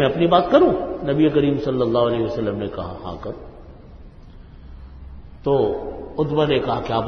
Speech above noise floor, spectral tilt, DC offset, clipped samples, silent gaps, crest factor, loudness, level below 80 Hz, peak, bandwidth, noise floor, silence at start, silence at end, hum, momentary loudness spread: 22 dB; -8.5 dB/octave; under 0.1%; under 0.1%; none; 20 dB; -20 LUFS; -42 dBFS; 0 dBFS; 6.4 kHz; -41 dBFS; 0 s; 0 s; none; 17 LU